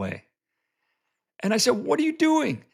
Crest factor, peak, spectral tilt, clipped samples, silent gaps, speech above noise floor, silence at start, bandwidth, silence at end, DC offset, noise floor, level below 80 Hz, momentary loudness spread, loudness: 18 dB; -8 dBFS; -4 dB/octave; under 0.1%; none; 59 dB; 0 s; 15 kHz; 0.15 s; under 0.1%; -82 dBFS; -74 dBFS; 11 LU; -23 LUFS